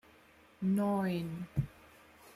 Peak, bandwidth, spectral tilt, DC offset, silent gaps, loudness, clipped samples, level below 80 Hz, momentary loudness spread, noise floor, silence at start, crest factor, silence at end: -22 dBFS; 15 kHz; -8 dB/octave; under 0.1%; none; -35 LUFS; under 0.1%; -58 dBFS; 7 LU; -62 dBFS; 0.6 s; 16 dB; 0.05 s